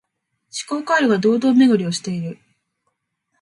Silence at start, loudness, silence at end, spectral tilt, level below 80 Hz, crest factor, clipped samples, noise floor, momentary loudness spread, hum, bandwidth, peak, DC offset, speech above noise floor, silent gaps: 0.55 s; -18 LUFS; 1.1 s; -5 dB/octave; -68 dBFS; 16 dB; under 0.1%; -73 dBFS; 16 LU; none; 11.5 kHz; -4 dBFS; under 0.1%; 56 dB; none